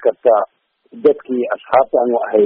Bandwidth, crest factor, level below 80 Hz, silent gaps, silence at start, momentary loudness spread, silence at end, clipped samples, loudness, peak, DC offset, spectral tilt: 4.3 kHz; 14 dB; -62 dBFS; none; 0 s; 7 LU; 0 s; under 0.1%; -16 LUFS; -2 dBFS; under 0.1%; -4.5 dB/octave